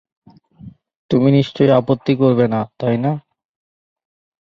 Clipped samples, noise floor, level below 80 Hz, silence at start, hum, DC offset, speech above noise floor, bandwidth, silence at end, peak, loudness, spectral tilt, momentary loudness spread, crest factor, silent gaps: under 0.1%; -41 dBFS; -56 dBFS; 0.65 s; none; under 0.1%; 26 dB; 6.8 kHz; 1.35 s; -2 dBFS; -16 LUFS; -9 dB/octave; 7 LU; 16 dB; 0.96-1.09 s